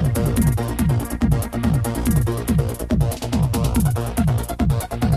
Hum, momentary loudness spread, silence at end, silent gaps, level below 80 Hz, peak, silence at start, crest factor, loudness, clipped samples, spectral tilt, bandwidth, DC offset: none; 2 LU; 0 s; none; -26 dBFS; -6 dBFS; 0 s; 14 dB; -21 LUFS; under 0.1%; -6.5 dB/octave; 14 kHz; under 0.1%